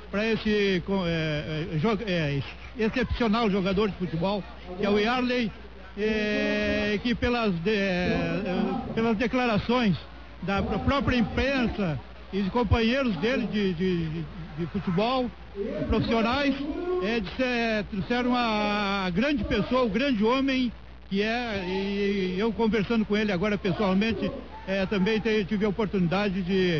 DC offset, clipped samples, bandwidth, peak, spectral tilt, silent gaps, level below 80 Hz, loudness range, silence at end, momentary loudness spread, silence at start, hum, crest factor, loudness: 0.4%; under 0.1%; 6.8 kHz; -12 dBFS; -7 dB/octave; none; -42 dBFS; 2 LU; 0 s; 7 LU; 0 s; none; 14 dB; -26 LUFS